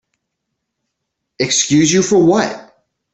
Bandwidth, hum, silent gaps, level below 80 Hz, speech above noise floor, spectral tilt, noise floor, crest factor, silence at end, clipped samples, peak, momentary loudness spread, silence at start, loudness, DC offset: 8.4 kHz; none; none; -54 dBFS; 63 dB; -4 dB/octave; -75 dBFS; 16 dB; 0.5 s; under 0.1%; -2 dBFS; 10 LU; 1.4 s; -13 LUFS; under 0.1%